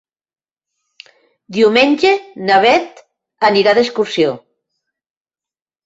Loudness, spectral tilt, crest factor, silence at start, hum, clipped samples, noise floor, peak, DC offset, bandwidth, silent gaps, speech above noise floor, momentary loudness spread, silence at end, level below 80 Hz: -13 LUFS; -4.5 dB/octave; 16 dB; 1.5 s; none; under 0.1%; under -90 dBFS; 0 dBFS; under 0.1%; 8 kHz; none; over 77 dB; 8 LU; 1.45 s; -60 dBFS